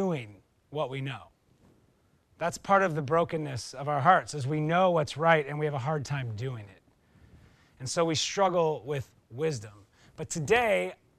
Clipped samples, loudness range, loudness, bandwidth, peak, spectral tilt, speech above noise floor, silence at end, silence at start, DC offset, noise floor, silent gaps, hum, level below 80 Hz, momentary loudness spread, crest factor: under 0.1%; 5 LU; -28 LUFS; 13.5 kHz; -8 dBFS; -5 dB/octave; 38 dB; 0.25 s; 0 s; under 0.1%; -66 dBFS; none; none; -64 dBFS; 15 LU; 22 dB